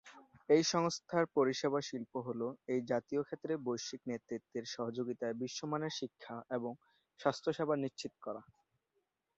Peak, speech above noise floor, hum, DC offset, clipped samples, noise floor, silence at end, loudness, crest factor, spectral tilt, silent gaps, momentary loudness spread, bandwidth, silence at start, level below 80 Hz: -16 dBFS; 47 dB; none; under 0.1%; under 0.1%; -84 dBFS; 0.95 s; -37 LUFS; 22 dB; -4.5 dB/octave; none; 13 LU; 8 kHz; 0.05 s; -80 dBFS